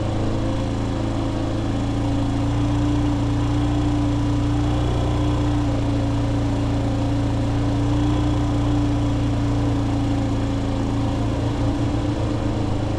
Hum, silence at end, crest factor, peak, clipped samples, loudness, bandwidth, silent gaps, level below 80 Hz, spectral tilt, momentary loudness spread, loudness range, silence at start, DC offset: none; 0 s; 12 dB; -10 dBFS; under 0.1%; -22 LUFS; 10 kHz; none; -28 dBFS; -7.5 dB/octave; 3 LU; 1 LU; 0 s; under 0.1%